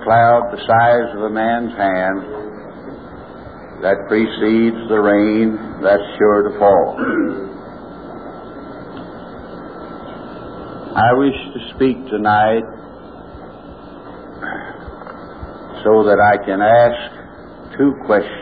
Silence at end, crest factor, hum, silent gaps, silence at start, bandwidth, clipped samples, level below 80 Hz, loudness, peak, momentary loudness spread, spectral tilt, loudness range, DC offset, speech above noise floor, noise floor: 0 s; 16 dB; none; none; 0 s; 4.9 kHz; under 0.1%; -46 dBFS; -15 LUFS; -2 dBFS; 22 LU; -10 dB/octave; 11 LU; 0.3%; 21 dB; -36 dBFS